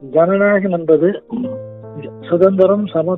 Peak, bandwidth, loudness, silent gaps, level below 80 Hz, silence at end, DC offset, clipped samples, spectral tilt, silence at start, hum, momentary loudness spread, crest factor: 0 dBFS; 4 kHz; -14 LUFS; none; -60 dBFS; 0 s; under 0.1%; under 0.1%; -10.5 dB/octave; 0 s; none; 19 LU; 14 dB